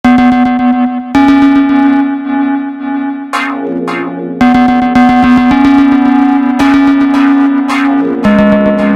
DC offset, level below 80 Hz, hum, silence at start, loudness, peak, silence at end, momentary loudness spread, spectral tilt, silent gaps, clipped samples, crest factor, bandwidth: under 0.1%; -36 dBFS; none; 0.05 s; -9 LUFS; 0 dBFS; 0 s; 9 LU; -6.5 dB/octave; none; 0.3%; 8 dB; 9 kHz